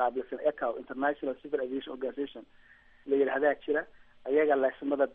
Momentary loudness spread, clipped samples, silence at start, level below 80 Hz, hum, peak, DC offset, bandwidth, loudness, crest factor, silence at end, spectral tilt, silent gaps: 13 LU; under 0.1%; 0 s; -68 dBFS; none; -14 dBFS; under 0.1%; 3.9 kHz; -31 LUFS; 16 dB; 0 s; -2.5 dB/octave; none